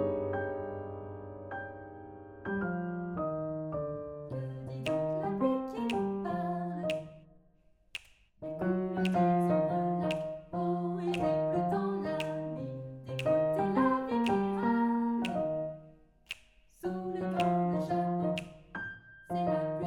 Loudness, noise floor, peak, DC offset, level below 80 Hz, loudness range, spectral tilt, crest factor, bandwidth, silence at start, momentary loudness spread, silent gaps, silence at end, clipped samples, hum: -33 LUFS; -65 dBFS; -16 dBFS; under 0.1%; -62 dBFS; 7 LU; -7.5 dB/octave; 16 dB; 16 kHz; 0 s; 15 LU; none; 0 s; under 0.1%; none